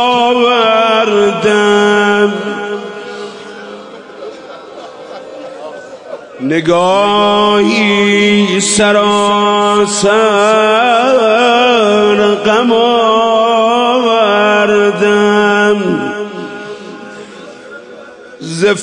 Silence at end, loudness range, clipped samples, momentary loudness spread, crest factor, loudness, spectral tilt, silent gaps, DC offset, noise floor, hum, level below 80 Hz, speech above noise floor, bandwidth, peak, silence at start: 0 s; 11 LU; under 0.1%; 20 LU; 10 dB; -10 LUFS; -3.5 dB/octave; none; under 0.1%; -32 dBFS; none; -54 dBFS; 23 dB; 10.5 kHz; 0 dBFS; 0 s